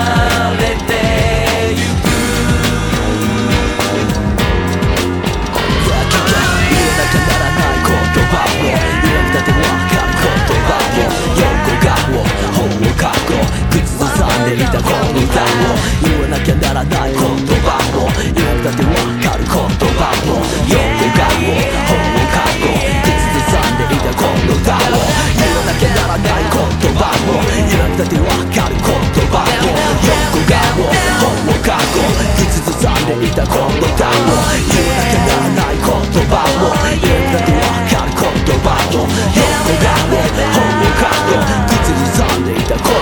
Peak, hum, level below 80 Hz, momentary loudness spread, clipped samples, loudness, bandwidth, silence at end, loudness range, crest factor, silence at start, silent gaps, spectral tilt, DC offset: 0 dBFS; none; -20 dBFS; 3 LU; under 0.1%; -13 LUFS; over 20 kHz; 0 s; 2 LU; 12 dB; 0 s; none; -5 dB/octave; under 0.1%